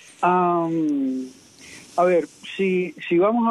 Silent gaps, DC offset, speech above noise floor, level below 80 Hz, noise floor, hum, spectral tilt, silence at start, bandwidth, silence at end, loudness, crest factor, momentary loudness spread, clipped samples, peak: none; under 0.1%; 24 dB; -70 dBFS; -45 dBFS; none; -7 dB/octave; 0.2 s; 11.5 kHz; 0 s; -22 LUFS; 14 dB; 14 LU; under 0.1%; -8 dBFS